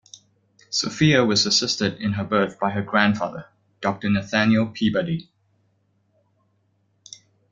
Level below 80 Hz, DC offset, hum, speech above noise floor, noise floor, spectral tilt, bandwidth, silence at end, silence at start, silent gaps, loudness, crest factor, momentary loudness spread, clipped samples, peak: -58 dBFS; under 0.1%; none; 46 dB; -67 dBFS; -4.5 dB/octave; 7.6 kHz; 2.3 s; 0.7 s; none; -21 LUFS; 22 dB; 10 LU; under 0.1%; -2 dBFS